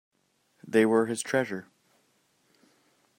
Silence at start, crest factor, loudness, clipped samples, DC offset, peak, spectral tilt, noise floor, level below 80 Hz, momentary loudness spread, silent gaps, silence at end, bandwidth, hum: 0.65 s; 20 dB; -26 LUFS; under 0.1%; under 0.1%; -10 dBFS; -5 dB/octave; -71 dBFS; -76 dBFS; 12 LU; none; 1.55 s; 16 kHz; none